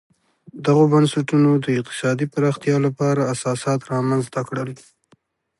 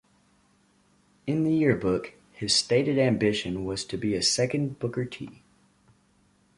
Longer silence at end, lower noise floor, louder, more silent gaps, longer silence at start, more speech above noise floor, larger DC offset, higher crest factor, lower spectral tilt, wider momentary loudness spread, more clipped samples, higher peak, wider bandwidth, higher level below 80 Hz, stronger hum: second, 0.85 s vs 1.25 s; second, -60 dBFS vs -64 dBFS; first, -20 LUFS vs -26 LUFS; neither; second, 0.55 s vs 1.25 s; about the same, 41 dB vs 39 dB; neither; about the same, 16 dB vs 20 dB; first, -6.5 dB/octave vs -4.5 dB/octave; second, 10 LU vs 13 LU; neither; first, -4 dBFS vs -8 dBFS; about the same, 11.5 kHz vs 11.5 kHz; second, -64 dBFS vs -56 dBFS; neither